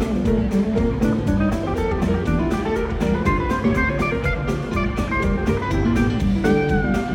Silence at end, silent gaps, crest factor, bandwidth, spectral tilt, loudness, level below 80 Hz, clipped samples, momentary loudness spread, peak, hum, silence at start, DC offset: 0 s; none; 14 dB; 16.5 kHz; -7.5 dB/octave; -21 LUFS; -28 dBFS; under 0.1%; 4 LU; -6 dBFS; none; 0 s; under 0.1%